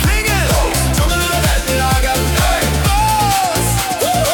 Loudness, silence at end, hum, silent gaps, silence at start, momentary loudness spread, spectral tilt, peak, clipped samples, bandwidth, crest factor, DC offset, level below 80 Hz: -14 LUFS; 0 s; none; none; 0 s; 2 LU; -3.5 dB/octave; -2 dBFS; under 0.1%; 19 kHz; 12 dB; under 0.1%; -20 dBFS